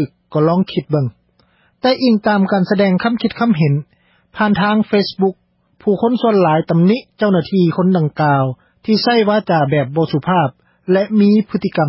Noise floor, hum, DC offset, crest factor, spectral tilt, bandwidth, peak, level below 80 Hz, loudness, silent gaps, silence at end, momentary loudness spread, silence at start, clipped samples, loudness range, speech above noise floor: -56 dBFS; none; under 0.1%; 14 dB; -11.5 dB/octave; 5.8 kHz; -2 dBFS; -54 dBFS; -15 LUFS; none; 0 s; 6 LU; 0 s; under 0.1%; 1 LU; 42 dB